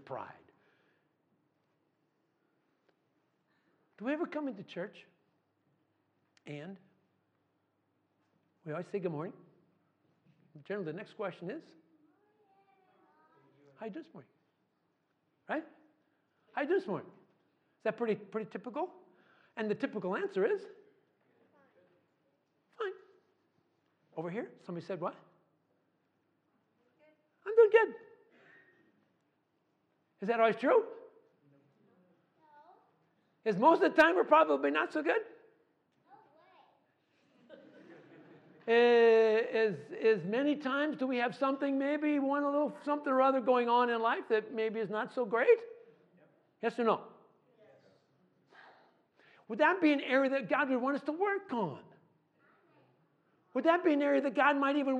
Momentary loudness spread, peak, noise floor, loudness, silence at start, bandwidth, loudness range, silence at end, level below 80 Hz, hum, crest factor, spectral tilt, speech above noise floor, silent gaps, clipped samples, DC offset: 19 LU; -12 dBFS; -78 dBFS; -31 LUFS; 0.1 s; 8.2 kHz; 18 LU; 0 s; -86 dBFS; none; 24 dB; -6.5 dB/octave; 47 dB; none; under 0.1%; under 0.1%